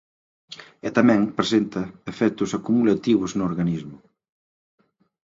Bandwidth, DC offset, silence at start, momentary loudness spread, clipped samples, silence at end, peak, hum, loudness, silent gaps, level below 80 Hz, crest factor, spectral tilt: 7.8 kHz; under 0.1%; 0.5 s; 18 LU; under 0.1%; 1.25 s; -2 dBFS; none; -22 LUFS; none; -58 dBFS; 22 dB; -6 dB/octave